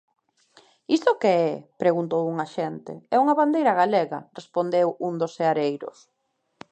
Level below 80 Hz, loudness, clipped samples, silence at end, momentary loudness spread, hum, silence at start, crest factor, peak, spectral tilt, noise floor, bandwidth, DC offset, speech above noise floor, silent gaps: -78 dBFS; -23 LUFS; under 0.1%; 0.8 s; 11 LU; none; 0.9 s; 20 dB; -4 dBFS; -6.5 dB/octave; -58 dBFS; 8.8 kHz; under 0.1%; 35 dB; none